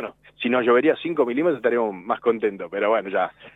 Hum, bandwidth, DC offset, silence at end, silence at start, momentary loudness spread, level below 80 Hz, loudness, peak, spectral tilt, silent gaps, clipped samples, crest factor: none; 4 kHz; under 0.1%; 0.05 s; 0 s; 7 LU; -68 dBFS; -22 LUFS; -6 dBFS; -7.5 dB/octave; none; under 0.1%; 16 dB